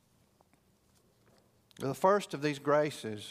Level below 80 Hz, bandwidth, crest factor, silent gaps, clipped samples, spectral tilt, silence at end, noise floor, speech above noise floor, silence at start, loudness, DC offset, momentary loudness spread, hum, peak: -76 dBFS; 15.5 kHz; 20 dB; none; under 0.1%; -5.5 dB/octave; 0 s; -69 dBFS; 38 dB; 1.8 s; -31 LUFS; under 0.1%; 11 LU; none; -14 dBFS